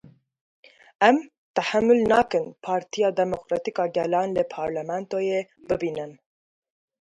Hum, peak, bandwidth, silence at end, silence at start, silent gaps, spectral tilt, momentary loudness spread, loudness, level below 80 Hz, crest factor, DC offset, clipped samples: none; -4 dBFS; 10.5 kHz; 0.85 s; 1 s; 1.38-1.54 s; -5.5 dB/octave; 10 LU; -24 LUFS; -60 dBFS; 20 dB; under 0.1%; under 0.1%